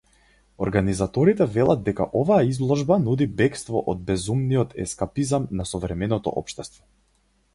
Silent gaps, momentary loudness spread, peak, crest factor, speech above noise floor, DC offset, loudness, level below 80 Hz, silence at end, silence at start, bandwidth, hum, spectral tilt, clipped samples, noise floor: none; 9 LU; -6 dBFS; 18 dB; 42 dB; under 0.1%; -23 LUFS; -44 dBFS; 0.85 s; 0.6 s; 11.5 kHz; none; -6.5 dB/octave; under 0.1%; -65 dBFS